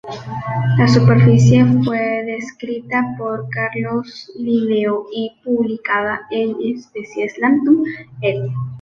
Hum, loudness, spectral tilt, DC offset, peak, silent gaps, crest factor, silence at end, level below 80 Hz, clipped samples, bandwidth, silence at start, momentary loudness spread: none; -17 LUFS; -7.5 dB/octave; under 0.1%; -2 dBFS; none; 16 dB; 0 s; -48 dBFS; under 0.1%; 7.6 kHz; 0.05 s; 15 LU